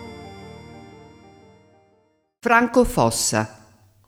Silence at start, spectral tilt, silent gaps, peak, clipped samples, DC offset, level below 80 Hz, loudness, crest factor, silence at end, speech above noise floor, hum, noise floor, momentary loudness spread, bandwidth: 0 s; -4 dB/octave; none; -2 dBFS; under 0.1%; under 0.1%; -42 dBFS; -19 LUFS; 22 dB; 0.55 s; 44 dB; none; -63 dBFS; 25 LU; 17 kHz